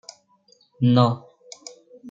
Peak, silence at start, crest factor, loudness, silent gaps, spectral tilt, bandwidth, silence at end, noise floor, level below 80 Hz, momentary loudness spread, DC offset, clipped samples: -4 dBFS; 0.8 s; 20 dB; -21 LUFS; none; -7.5 dB/octave; 7.8 kHz; 0 s; -60 dBFS; -68 dBFS; 25 LU; under 0.1%; under 0.1%